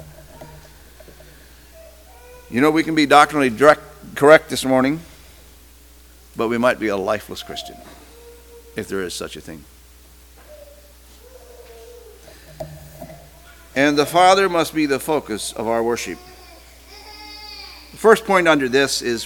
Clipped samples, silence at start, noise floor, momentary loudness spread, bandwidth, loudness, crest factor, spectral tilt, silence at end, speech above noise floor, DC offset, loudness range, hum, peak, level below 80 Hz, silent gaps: under 0.1%; 0 s; -46 dBFS; 23 LU; 19 kHz; -17 LUFS; 20 dB; -4 dB/octave; 0 s; 29 dB; under 0.1%; 17 LU; none; 0 dBFS; -48 dBFS; none